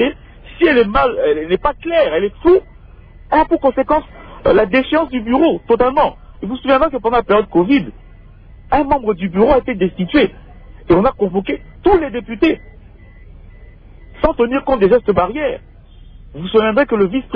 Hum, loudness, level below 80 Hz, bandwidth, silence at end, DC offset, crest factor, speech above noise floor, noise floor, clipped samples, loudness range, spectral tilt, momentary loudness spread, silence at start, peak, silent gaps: none; -15 LUFS; -34 dBFS; 5.2 kHz; 0 s; under 0.1%; 14 dB; 25 dB; -39 dBFS; under 0.1%; 3 LU; -9 dB/octave; 7 LU; 0 s; -2 dBFS; none